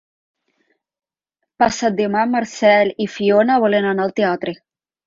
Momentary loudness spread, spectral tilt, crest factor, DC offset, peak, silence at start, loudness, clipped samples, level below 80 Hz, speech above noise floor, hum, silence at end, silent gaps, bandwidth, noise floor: 6 LU; -5 dB/octave; 16 dB; under 0.1%; -2 dBFS; 1.6 s; -17 LUFS; under 0.1%; -58 dBFS; 62 dB; none; 0.5 s; none; 7.8 kHz; -78 dBFS